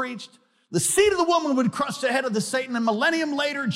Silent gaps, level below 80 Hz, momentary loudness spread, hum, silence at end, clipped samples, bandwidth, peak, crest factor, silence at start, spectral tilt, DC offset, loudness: none; -60 dBFS; 9 LU; none; 0 s; under 0.1%; 16.5 kHz; -8 dBFS; 16 dB; 0 s; -3.5 dB/octave; under 0.1%; -23 LUFS